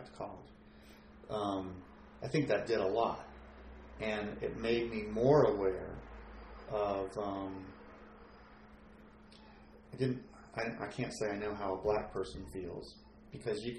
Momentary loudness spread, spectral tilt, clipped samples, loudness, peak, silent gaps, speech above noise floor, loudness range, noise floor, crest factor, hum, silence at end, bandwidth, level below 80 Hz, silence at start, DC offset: 24 LU; -6.5 dB/octave; under 0.1%; -36 LUFS; -14 dBFS; none; 22 dB; 10 LU; -57 dBFS; 22 dB; none; 0 s; 11.5 kHz; -58 dBFS; 0 s; under 0.1%